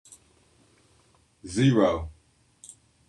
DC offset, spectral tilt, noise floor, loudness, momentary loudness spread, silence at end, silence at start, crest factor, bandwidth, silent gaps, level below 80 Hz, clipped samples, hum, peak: under 0.1%; -6.5 dB/octave; -63 dBFS; -24 LUFS; 27 LU; 1 s; 1.45 s; 20 dB; 11 kHz; none; -54 dBFS; under 0.1%; none; -8 dBFS